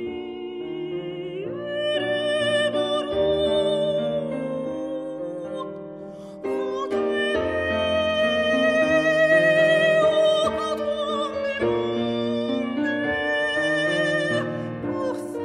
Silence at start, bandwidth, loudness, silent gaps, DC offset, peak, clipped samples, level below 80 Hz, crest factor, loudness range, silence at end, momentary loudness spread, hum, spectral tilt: 0 s; 10.5 kHz; -23 LUFS; none; under 0.1%; -8 dBFS; under 0.1%; -54 dBFS; 16 dB; 8 LU; 0 s; 14 LU; none; -5 dB/octave